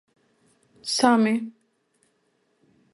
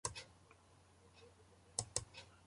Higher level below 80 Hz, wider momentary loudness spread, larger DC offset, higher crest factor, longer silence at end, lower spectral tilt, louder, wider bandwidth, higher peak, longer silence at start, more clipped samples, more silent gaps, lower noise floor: second, -74 dBFS vs -68 dBFS; second, 18 LU vs 25 LU; neither; second, 22 dB vs 32 dB; first, 1.45 s vs 0 s; first, -3.5 dB/octave vs -1.5 dB/octave; first, -22 LUFS vs -45 LUFS; about the same, 11.5 kHz vs 11.5 kHz; first, -4 dBFS vs -20 dBFS; first, 0.85 s vs 0.05 s; neither; neither; about the same, -69 dBFS vs -68 dBFS